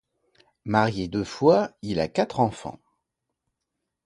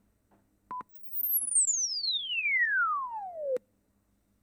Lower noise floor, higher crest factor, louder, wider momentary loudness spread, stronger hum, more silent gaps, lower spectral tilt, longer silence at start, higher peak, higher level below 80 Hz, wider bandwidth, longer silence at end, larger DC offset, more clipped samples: first, -82 dBFS vs -72 dBFS; first, 22 dB vs 14 dB; first, -24 LUFS vs -28 LUFS; about the same, 16 LU vs 16 LU; neither; neither; first, -6.5 dB/octave vs 3 dB/octave; about the same, 0.65 s vs 0.7 s; first, -4 dBFS vs -18 dBFS; first, -54 dBFS vs -76 dBFS; second, 11.5 kHz vs over 20 kHz; first, 1.35 s vs 0.85 s; neither; neither